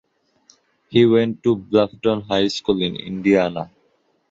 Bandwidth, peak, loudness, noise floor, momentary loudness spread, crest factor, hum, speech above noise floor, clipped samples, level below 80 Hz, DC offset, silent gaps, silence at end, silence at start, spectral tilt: 7.8 kHz; -2 dBFS; -19 LUFS; -64 dBFS; 9 LU; 18 dB; none; 45 dB; under 0.1%; -54 dBFS; under 0.1%; none; 0.65 s; 0.9 s; -6.5 dB/octave